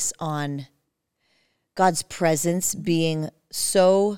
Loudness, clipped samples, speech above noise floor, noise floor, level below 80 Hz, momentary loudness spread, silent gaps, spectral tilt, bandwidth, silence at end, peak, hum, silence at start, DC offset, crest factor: -23 LUFS; under 0.1%; 52 dB; -74 dBFS; -62 dBFS; 13 LU; none; -4 dB/octave; 18 kHz; 0 s; -6 dBFS; none; 0 s; 0.4%; 18 dB